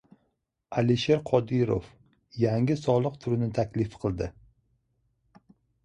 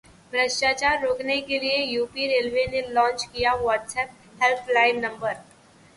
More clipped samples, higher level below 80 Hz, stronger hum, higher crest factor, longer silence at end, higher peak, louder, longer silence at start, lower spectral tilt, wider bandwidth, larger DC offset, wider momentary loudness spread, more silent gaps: neither; about the same, -52 dBFS vs -54 dBFS; neither; about the same, 20 dB vs 18 dB; first, 1.55 s vs 0.55 s; second, -10 dBFS vs -6 dBFS; second, -27 LUFS vs -23 LUFS; first, 0.7 s vs 0.3 s; first, -7.5 dB/octave vs -2.5 dB/octave; second, 9 kHz vs 11.5 kHz; neither; about the same, 8 LU vs 9 LU; neither